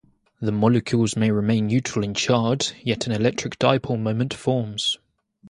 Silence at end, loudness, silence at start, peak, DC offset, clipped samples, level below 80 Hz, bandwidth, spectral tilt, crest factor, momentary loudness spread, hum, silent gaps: 0 s; -22 LUFS; 0.4 s; 0 dBFS; under 0.1%; under 0.1%; -54 dBFS; 11.5 kHz; -5.5 dB/octave; 22 dB; 5 LU; none; none